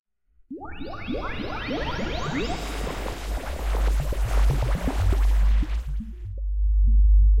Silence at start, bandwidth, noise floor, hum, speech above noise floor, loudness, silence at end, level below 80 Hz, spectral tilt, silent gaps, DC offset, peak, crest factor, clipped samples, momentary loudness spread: 0.5 s; 12 kHz; -47 dBFS; none; 18 dB; -26 LUFS; 0 s; -24 dBFS; -6 dB/octave; none; under 0.1%; -10 dBFS; 12 dB; under 0.1%; 13 LU